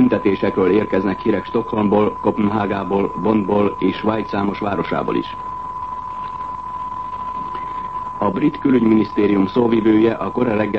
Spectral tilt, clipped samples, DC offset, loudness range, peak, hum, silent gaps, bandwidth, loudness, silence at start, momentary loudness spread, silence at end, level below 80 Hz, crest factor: -9 dB/octave; under 0.1%; 0.4%; 7 LU; -2 dBFS; none; none; 6.2 kHz; -19 LUFS; 0 s; 11 LU; 0 s; -46 dBFS; 16 dB